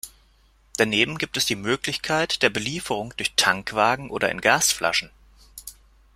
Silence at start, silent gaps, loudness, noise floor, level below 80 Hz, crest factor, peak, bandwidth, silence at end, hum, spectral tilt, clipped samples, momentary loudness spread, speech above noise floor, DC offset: 0.05 s; none; -22 LUFS; -58 dBFS; -54 dBFS; 24 dB; -2 dBFS; 16 kHz; 0.45 s; none; -2 dB/octave; under 0.1%; 17 LU; 35 dB; under 0.1%